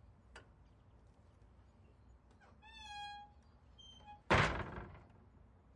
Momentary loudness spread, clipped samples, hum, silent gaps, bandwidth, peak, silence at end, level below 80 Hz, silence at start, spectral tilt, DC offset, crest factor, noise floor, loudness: 28 LU; under 0.1%; none; none; 11 kHz; -18 dBFS; 0.7 s; -56 dBFS; 0.1 s; -5 dB/octave; under 0.1%; 26 dB; -65 dBFS; -38 LUFS